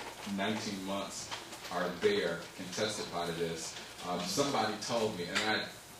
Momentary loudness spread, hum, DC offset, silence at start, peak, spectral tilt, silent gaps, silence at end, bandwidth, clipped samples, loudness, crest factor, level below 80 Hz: 9 LU; none; under 0.1%; 0 s; -18 dBFS; -3.5 dB/octave; none; 0 s; 16.5 kHz; under 0.1%; -35 LUFS; 18 dB; -66 dBFS